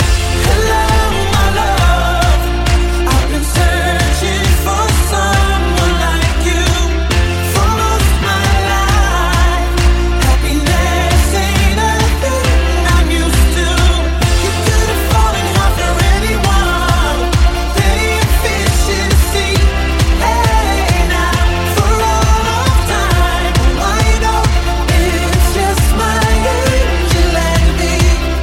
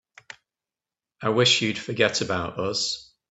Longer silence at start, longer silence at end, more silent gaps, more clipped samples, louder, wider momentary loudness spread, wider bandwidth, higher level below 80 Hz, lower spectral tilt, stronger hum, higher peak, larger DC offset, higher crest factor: second, 0 s vs 1.2 s; second, 0 s vs 0.3 s; neither; neither; first, -13 LUFS vs -23 LUFS; second, 2 LU vs 9 LU; first, 16.5 kHz vs 8.4 kHz; first, -14 dBFS vs -62 dBFS; first, -4.5 dB/octave vs -3 dB/octave; neither; first, 0 dBFS vs -4 dBFS; neither; second, 10 dB vs 22 dB